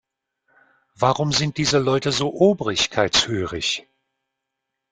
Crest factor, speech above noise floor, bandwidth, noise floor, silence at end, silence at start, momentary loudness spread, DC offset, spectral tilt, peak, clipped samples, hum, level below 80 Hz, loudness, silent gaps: 20 dB; 61 dB; 9.6 kHz; -81 dBFS; 1.1 s; 1 s; 6 LU; under 0.1%; -4 dB/octave; -2 dBFS; under 0.1%; none; -52 dBFS; -20 LUFS; none